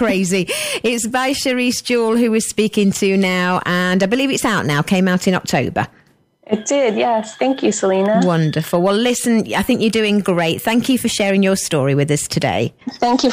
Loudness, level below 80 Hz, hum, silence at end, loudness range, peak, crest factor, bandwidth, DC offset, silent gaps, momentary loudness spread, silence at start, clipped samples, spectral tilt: -16 LUFS; -50 dBFS; none; 0 s; 2 LU; -2 dBFS; 14 dB; 15.5 kHz; under 0.1%; none; 3 LU; 0 s; under 0.1%; -4.5 dB/octave